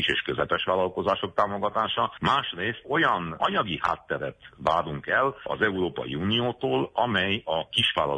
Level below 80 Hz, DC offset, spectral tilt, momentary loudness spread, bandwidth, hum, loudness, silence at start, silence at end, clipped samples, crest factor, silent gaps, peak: -56 dBFS; under 0.1%; -5.5 dB/octave; 6 LU; 10 kHz; none; -26 LUFS; 0 s; 0 s; under 0.1%; 18 dB; none; -8 dBFS